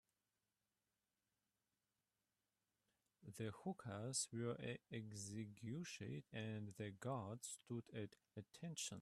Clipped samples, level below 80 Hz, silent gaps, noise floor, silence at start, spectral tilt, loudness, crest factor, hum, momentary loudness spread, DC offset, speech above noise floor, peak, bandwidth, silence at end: under 0.1%; -84 dBFS; none; under -90 dBFS; 3.2 s; -4.5 dB/octave; -50 LUFS; 20 dB; none; 9 LU; under 0.1%; over 40 dB; -32 dBFS; 13.5 kHz; 0 s